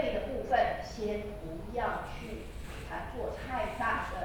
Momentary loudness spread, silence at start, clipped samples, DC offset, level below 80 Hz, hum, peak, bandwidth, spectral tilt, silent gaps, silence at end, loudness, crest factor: 13 LU; 0 s; under 0.1%; under 0.1%; -46 dBFS; none; -16 dBFS; 19.5 kHz; -5.5 dB/octave; none; 0 s; -35 LUFS; 18 dB